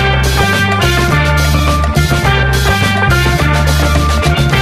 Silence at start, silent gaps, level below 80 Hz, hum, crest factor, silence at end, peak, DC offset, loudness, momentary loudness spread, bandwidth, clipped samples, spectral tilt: 0 s; none; -16 dBFS; none; 10 dB; 0 s; 0 dBFS; under 0.1%; -11 LUFS; 1 LU; 15.5 kHz; under 0.1%; -5 dB/octave